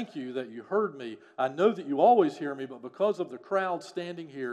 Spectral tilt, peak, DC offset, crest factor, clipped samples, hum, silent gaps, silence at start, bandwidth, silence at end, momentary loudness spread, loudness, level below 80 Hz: -6.5 dB/octave; -10 dBFS; under 0.1%; 20 dB; under 0.1%; none; none; 0 s; 9.8 kHz; 0 s; 16 LU; -29 LUFS; -90 dBFS